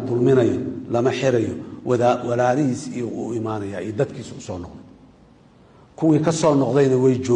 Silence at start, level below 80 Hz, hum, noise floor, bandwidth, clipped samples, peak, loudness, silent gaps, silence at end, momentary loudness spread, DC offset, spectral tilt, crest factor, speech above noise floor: 0 s; -56 dBFS; none; -51 dBFS; 10 kHz; under 0.1%; -6 dBFS; -20 LUFS; none; 0 s; 14 LU; under 0.1%; -7 dB/octave; 14 dB; 31 dB